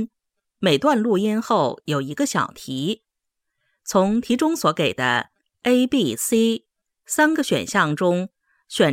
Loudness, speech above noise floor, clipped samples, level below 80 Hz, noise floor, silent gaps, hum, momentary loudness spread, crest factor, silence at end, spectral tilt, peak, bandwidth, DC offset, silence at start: -21 LUFS; 61 dB; under 0.1%; -62 dBFS; -81 dBFS; none; none; 9 LU; 18 dB; 0 s; -4.5 dB/octave; -4 dBFS; 16.5 kHz; under 0.1%; 0 s